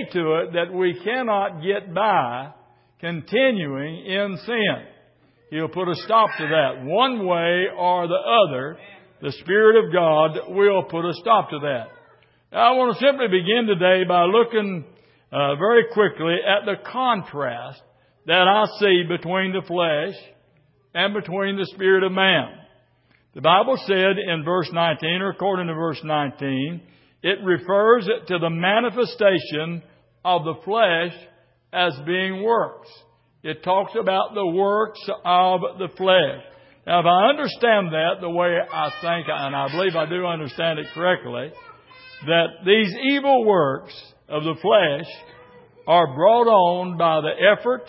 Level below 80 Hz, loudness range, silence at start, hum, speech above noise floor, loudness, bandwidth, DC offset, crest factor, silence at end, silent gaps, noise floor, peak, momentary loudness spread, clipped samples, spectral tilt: -70 dBFS; 4 LU; 0 s; none; 41 dB; -20 LUFS; 5.8 kHz; under 0.1%; 18 dB; 0.05 s; none; -61 dBFS; -2 dBFS; 12 LU; under 0.1%; -10 dB/octave